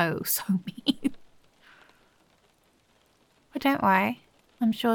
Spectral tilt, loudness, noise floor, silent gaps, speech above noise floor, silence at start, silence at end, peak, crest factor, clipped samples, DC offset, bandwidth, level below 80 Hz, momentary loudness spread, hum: -4.5 dB/octave; -27 LUFS; -65 dBFS; none; 40 dB; 0 s; 0 s; -8 dBFS; 22 dB; under 0.1%; under 0.1%; 17.5 kHz; -64 dBFS; 10 LU; none